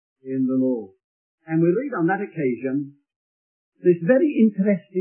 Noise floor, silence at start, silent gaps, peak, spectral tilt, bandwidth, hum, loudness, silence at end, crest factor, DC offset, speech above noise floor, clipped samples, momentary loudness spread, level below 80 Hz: under -90 dBFS; 0.25 s; 1.04-1.38 s, 3.16-3.72 s; -4 dBFS; -13 dB/octave; 3.2 kHz; none; -22 LUFS; 0 s; 18 dB; under 0.1%; over 70 dB; under 0.1%; 10 LU; -76 dBFS